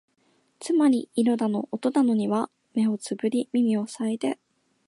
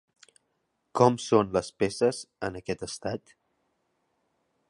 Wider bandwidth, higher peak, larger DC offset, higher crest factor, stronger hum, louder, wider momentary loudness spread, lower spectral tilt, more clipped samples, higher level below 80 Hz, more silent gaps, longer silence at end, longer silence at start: about the same, 11.5 kHz vs 11.5 kHz; second, -12 dBFS vs -6 dBFS; neither; second, 14 dB vs 24 dB; neither; first, -25 LUFS vs -28 LUFS; second, 7 LU vs 12 LU; about the same, -6 dB/octave vs -5.5 dB/octave; neither; second, -76 dBFS vs -60 dBFS; neither; second, 0.55 s vs 1.5 s; second, 0.6 s vs 0.95 s